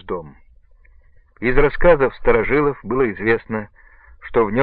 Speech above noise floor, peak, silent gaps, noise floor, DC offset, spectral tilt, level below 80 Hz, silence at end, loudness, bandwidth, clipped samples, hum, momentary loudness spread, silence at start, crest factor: 32 dB; 0 dBFS; none; -49 dBFS; under 0.1%; -11 dB/octave; -28 dBFS; 0 s; -18 LUFS; 4.4 kHz; under 0.1%; none; 15 LU; 0.05 s; 18 dB